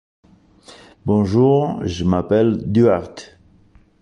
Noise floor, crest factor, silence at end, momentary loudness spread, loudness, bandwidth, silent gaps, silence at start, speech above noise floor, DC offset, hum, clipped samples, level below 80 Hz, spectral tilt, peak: -52 dBFS; 16 dB; 0.75 s; 12 LU; -17 LUFS; 10 kHz; none; 0.7 s; 35 dB; under 0.1%; none; under 0.1%; -40 dBFS; -8 dB/octave; -4 dBFS